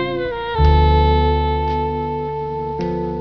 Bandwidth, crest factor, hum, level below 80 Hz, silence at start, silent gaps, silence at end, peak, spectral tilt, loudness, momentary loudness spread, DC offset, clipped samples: 5.4 kHz; 16 dB; none; -20 dBFS; 0 s; none; 0 s; -2 dBFS; -9 dB/octave; -18 LUFS; 10 LU; 0.4%; under 0.1%